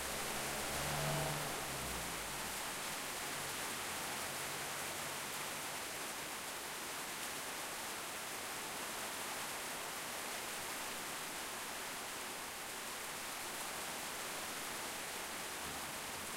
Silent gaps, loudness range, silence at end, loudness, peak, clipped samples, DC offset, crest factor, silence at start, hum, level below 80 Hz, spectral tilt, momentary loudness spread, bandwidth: none; 3 LU; 0 s; -41 LUFS; -26 dBFS; under 0.1%; under 0.1%; 16 dB; 0 s; none; -64 dBFS; -1.5 dB/octave; 4 LU; 16 kHz